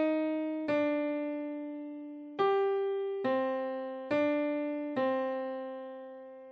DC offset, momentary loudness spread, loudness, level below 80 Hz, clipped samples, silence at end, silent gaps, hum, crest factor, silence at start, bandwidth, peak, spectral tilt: under 0.1%; 13 LU; -33 LUFS; -86 dBFS; under 0.1%; 0 s; none; none; 16 dB; 0 s; 6.2 kHz; -16 dBFS; -3.5 dB/octave